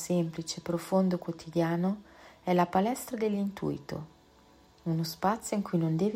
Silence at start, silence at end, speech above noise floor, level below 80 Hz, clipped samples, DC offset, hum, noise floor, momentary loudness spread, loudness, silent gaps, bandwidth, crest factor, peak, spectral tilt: 0 s; 0 s; 30 dB; -64 dBFS; under 0.1%; under 0.1%; none; -59 dBFS; 11 LU; -31 LUFS; none; 16 kHz; 16 dB; -14 dBFS; -6.5 dB/octave